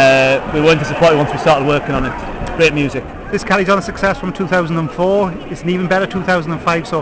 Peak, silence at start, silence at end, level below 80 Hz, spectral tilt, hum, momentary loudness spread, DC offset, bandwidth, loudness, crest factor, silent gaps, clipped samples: -2 dBFS; 0 s; 0 s; -34 dBFS; -5.5 dB/octave; none; 9 LU; under 0.1%; 8 kHz; -15 LUFS; 12 dB; none; under 0.1%